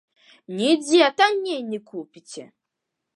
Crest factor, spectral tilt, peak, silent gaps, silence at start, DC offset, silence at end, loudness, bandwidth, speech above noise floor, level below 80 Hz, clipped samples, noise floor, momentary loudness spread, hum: 20 dB; -3.5 dB/octave; -4 dBFS; none; 0.5 s; under 0.1%; 0.7 s; -20 LUFS; 11.5 kHz; 60 dB; -82 dBFS; under 0.1%; -82 dBFS; 22 LU; none